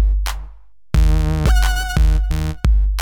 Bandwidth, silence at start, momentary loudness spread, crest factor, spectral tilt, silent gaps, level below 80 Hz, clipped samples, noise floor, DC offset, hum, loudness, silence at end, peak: 16 kHz; 0 s; 6 LU; 16 dB; -5.5 dB/octave; none; -16 dBFS; under 0.1%; -41 dBFS; 1%; none; -19 LUFS; 0 s; 0 dBFS